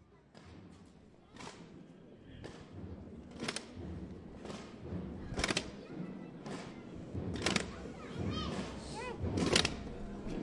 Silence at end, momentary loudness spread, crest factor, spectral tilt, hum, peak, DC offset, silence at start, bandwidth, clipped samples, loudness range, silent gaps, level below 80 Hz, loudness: 0 s; 21 LU; 28 dB; -4 dB/octave; none; -12 dBFS; under 0.1%; 0 s; 11.5 kHz; under 0.1%; 11 LU; none; -54 dBFS; -39 LUFS